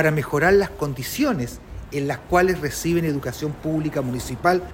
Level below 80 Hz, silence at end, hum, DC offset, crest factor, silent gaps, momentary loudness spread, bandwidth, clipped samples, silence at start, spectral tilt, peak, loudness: -42 dBFS; 0 s; none; under 0.1%; 18 dB; none; 10 LU; 16.5 kHz; under 0.1%; 0 s; -5.5 dB/octave; -4 dBFS; -22 LUFS